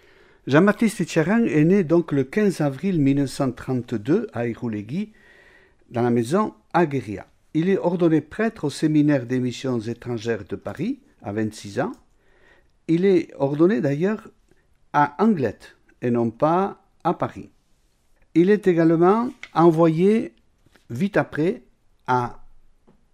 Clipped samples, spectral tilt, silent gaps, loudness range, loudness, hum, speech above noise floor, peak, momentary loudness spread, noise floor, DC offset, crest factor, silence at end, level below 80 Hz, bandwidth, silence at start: under 0.1%; -7.5 dB/octave; none; 6 LU; -22 LUFS; none; 41 dB; -4 dBFS; 12 LU; -62 dBFS; under 0.1%; 18 dB; 0.8 s; -56 dBFS; 13.5 kHz; 0.45 s